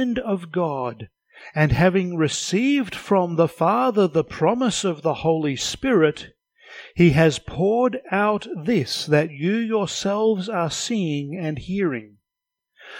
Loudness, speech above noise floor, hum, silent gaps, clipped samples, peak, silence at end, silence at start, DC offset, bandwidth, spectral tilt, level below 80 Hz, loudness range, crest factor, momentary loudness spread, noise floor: -21 LUFS; 64 dB; none; none; under 0.1%; -4 dBFS; 0 s; 0 s; under 0.1%; 16.5 kHz; -5.5 dB/octave; -46 dBFS; 3 LU; 18 dB; 8 LU; -85 dBFS